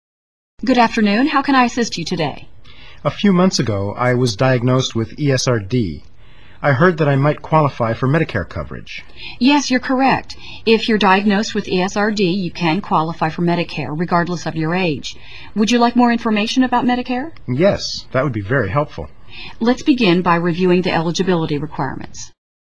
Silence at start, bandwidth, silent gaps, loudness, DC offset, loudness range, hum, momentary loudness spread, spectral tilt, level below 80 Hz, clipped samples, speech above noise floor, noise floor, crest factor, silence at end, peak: 0.55 s; 11 kHz; none; -17 LUFS; 2%; 2 LU; none; 12 LU; -5.5 dB/octave; -44 dBFS; under 0.1%; 29 dB; -45 dBFS; 16 dB; 0.4 s; 0 dBFS